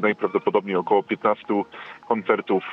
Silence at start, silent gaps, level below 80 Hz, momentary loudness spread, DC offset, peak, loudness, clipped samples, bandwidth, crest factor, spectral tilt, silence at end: 0 s; none; -70 dBFS; 5 LU; under 0.1%; -6 dBFS; -23 LUFS; under 0.1%; 5.6 kHz; 18 dB; -8 dB/octave; 0 s